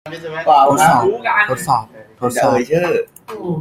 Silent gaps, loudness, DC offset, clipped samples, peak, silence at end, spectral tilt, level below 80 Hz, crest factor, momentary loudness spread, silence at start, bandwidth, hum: none; -15 LUFS; under 0.1%; under 0.1%; 0 dBFS; 0 s; -4.5 dB/octave; -52 dBFS; 14 dB; 13 LU; 0.05 s; 16 kHz; none